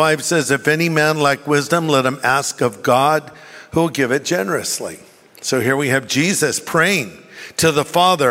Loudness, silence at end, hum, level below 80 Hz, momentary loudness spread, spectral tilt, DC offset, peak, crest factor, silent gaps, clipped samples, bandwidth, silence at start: -17 LUFS; 0 s; none; -56 dBFS; 8 LU; -4 dB/octave; under 0.1%; -2 dBFS; 16 dB; none; under 0.1%; 16 kHz; 0 s